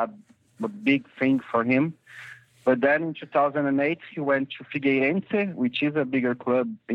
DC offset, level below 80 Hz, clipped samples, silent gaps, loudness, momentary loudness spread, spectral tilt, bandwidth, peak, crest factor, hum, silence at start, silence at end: under 0.1%; -74 dBFS; under 0.1%; none; -25 LUFS; 9 LU; -8 dB/octave; 5.4 kHz; -8 dBFS; 18 dB; none; 0 s; 0 s